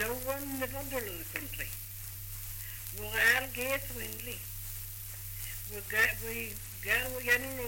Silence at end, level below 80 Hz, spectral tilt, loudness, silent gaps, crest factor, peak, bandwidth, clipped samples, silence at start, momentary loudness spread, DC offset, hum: 0 s; -50 dBFS; -2.5 dB/octave; -33 LUFS; none; 20 dB; -14 dBFS; 17 kHz; under 0.1%; 0 s; 13 LU; under 0.1%; none